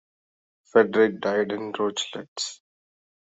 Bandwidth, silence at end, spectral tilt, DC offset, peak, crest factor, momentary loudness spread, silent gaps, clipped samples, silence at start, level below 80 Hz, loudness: 8.2 kHz; 0.8 s; -3.5 dB/octave; under 0.1%; -6 dBFS; 20 dB; 11 LU; 2.28-2.36 s; under 0.1%; 0.75 s; -72 dBFS; -24 LUFS